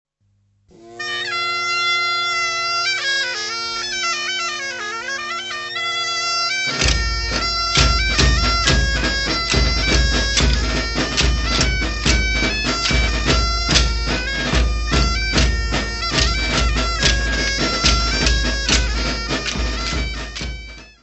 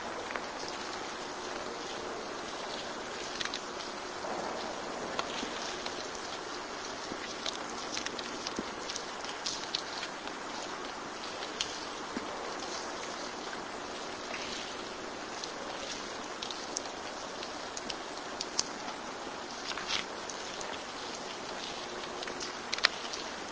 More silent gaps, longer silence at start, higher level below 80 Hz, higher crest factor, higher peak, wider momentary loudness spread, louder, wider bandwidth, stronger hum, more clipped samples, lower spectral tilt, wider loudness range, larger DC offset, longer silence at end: neither; first, 0.8 s vs 0 s; first, -24 dBFS vs -64 dBFS; second, 18 dB vs 36 dB; about the same, 0 dBFS vs -2 dBFS; first, 8 LU vs 5 LU; first, -18 LUFS vs -37 LUFS; about the same, 8.4 kHz vs 8 kHz; neither; neither; first, -3 dB/octave vs -1.5 dB/octave; about the same, 4 LU vs 2 LU; neither; about the same, 0.1 s vs 0 s